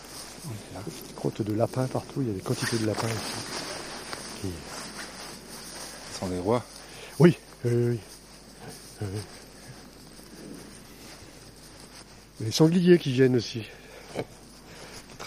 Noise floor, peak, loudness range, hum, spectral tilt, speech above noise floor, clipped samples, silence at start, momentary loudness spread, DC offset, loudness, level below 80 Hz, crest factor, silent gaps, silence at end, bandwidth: -49 dBFS; -4 dBFS; 16 LU; none; -5.5 dB/octave; 23 dB; under 0.1%; 0 s; 24 LU; under 0.1%; -28 LUFS; -56 dBFS; 24 dB; none; 0 s; 15.5 kHz